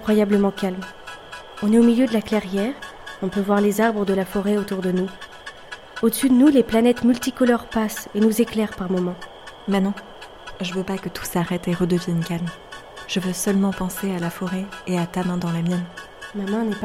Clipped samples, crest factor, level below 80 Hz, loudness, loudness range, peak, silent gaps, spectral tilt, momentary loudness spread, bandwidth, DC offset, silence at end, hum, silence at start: under 0.1%; 18 dB; -50 dBFS; -21 LUFS; 6 LU; -4 dBFS; none; -6 dB/octave; 19 LU; 16.5 kHz; under 0.1%; 0 s; none; 0 s